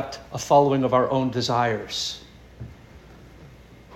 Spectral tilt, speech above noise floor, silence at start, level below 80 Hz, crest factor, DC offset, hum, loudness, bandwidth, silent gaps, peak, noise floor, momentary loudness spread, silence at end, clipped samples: -5 dB/octave; 25 dB; 0 s; -52 dBFS; 20 dB; under 0.1%; none; -22 LUFS; 16 kHz; none; -6 dBFS; -47 dBFS; 24 LU; 0 s; under 0.1%